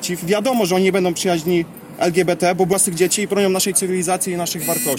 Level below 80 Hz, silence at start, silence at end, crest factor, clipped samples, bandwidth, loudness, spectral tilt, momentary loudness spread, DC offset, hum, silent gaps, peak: -56 dBFS; 0 s; 0 s; 16 dB; under 0.1%; 17 kHz; -18 LUFS; -4 dB/octave; 5 LU; under 0.1%; none; none; -2 dBFS